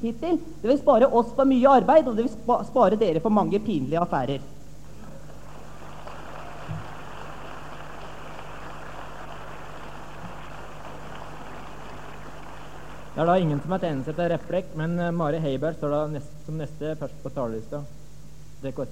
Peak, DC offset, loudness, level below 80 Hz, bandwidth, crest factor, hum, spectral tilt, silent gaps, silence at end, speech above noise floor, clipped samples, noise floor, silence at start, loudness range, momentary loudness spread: -6 dBFS; 1%; -24 LUFS; -50 dBFS; 16 kHz; 20 dB; 50 Hz at -45 dBFS; -7.5 dB/octave; none; 0 s; 23 dB; under 0.1%; -46 dBFS; 0 s; 20 LU; 22 LU